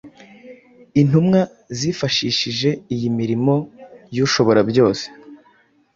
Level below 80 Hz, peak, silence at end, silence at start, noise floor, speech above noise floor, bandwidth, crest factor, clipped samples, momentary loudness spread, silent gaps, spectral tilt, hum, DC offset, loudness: -54 dBFS; -2 dBFS; 0.6 s; 0.05 s; -56 dBFS; 39 dB; 7.6 kHz; 16 dB; under 0.1%; 10 LU; none; -5.5 dB/octave; none; under 0.1%; -18 LUFS